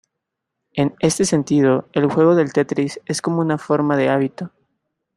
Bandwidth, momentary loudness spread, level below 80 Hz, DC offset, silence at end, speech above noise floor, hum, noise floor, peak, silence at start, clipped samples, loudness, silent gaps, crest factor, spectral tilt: 13 kHz; 9 LU; -58 dBFS; under 0.1%; 0.7 s; 62 dB; none; -80 dBFS; -2 dBFS; 0.75 s; under 0.1%; -18 LUFS; none; 16 dB; -5.5 dB/octave